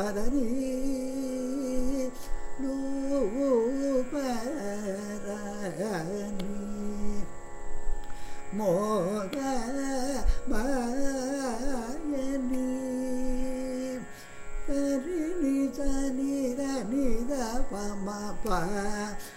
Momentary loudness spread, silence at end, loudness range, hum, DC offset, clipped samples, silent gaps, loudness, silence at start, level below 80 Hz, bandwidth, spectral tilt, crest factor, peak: 10 LU; 0 s; 4 LU; none; under 0.1%; under 0.1%; none; -32 LUFS; 0 s; -36 dBFS; 15 kHz; -5.5 dB/octave; 16 dB; -12 dBFS